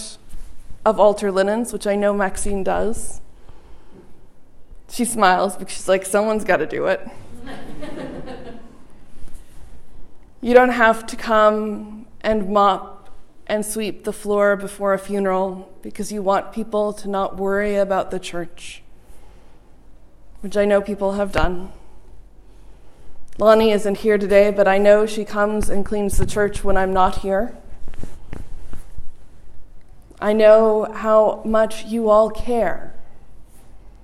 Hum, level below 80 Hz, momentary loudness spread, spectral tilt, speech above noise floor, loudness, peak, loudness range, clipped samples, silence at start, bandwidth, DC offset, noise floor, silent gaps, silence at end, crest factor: none; -36 dBFS; 20 LU; -5 dB/octave; 24 dB; -19 LUFS; 0 dBFS; 8 LU; under 0.1%; 0 s; 14.5 kHz; under 0.1%; -41 dBFS; none; 0.05 s; 20 dB